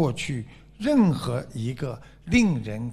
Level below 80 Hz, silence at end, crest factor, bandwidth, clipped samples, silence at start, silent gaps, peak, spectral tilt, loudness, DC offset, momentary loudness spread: -46 dBFS; 0 s; 18 dB; 13 kHz; under 0.1%; 0 s; none; -8 dBFS; -6.5 dB/octave; -25 LUFS; under 0.1%; 13 LU